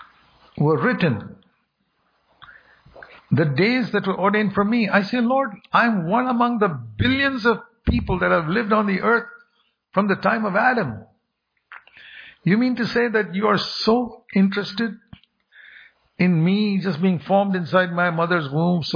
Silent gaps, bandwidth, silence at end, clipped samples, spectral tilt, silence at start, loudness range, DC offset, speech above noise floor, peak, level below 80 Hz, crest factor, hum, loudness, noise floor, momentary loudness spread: none; 5.2 kHz; 0 s; under 0.1%; -7.5 dB/octave; 0 s; 4 LU; under 0.1%; 54 dB; -4 dBFS; -44 dBFS; 18 dB; none; -20 LUFS; -73 dBFS; 6 LU